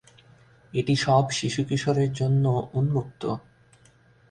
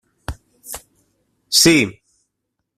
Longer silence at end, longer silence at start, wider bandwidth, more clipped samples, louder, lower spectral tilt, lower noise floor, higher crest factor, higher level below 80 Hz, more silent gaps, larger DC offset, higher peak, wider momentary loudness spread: about the same, 0.9 s vs 0.85 s; first, 0.75 s vs 0.3 s; second, 9.8 kHz vs 16 kHz; neither; second, -25 LUFS vs -14 LUFS; first, -6 dB/octave vs -2.5 dB/octave; second, -57 dBFS vs -77 dBFS; about the same, 18 dB vs 22 dB; second, -56 dBFS vs -44 dBFS; neither; neither; second, -8 dBFS vs 0 dBFS; second, 11 LU vs 23 LU